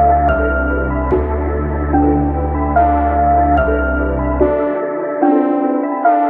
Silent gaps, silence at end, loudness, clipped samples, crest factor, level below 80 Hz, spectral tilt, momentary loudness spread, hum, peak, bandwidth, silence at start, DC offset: none; 0 s; -15 LUFS; under 0.1%; 14 dB; -22 dBFS; -12 dB/octave; 5 LU; none; 0 dBFS; 3.4 kHz; 0 s; under 0.1%